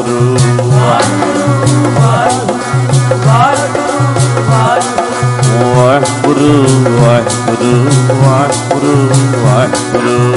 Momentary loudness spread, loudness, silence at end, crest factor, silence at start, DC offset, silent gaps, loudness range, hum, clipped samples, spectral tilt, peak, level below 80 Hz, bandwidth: 4 LU; -9 LUFS; 0 s; 8 dB; 0 s; under 0.1%; none; 1 LU; none; under 0.1%; -6 dB/octave; 0 dBFS; -40 dBFS; 11.5 kHz